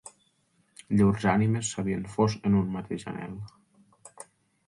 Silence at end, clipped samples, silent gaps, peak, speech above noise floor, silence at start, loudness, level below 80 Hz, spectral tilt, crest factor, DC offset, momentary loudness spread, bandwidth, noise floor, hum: 0.45 s; under 0.1%; none; -10 dBFS; 43 dB; 0.05 s; -27 LUFS; -54 dBFS; -6.5 dB/octave; 18 dB; under 0.1%; 23 LU; 11.5 kHz; -69 dBFS; none